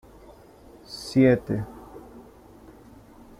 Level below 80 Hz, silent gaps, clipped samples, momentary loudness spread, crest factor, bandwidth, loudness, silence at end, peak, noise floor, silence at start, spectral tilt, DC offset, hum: -52 dBFS; none; under 0.1%; 25 LU; 22 dB; 14 kHz; -23 LUFS; 1.2 s; -6 dBFS; -50 dBFS; 0.9 s; -7 dB/octave; under 0.1%; none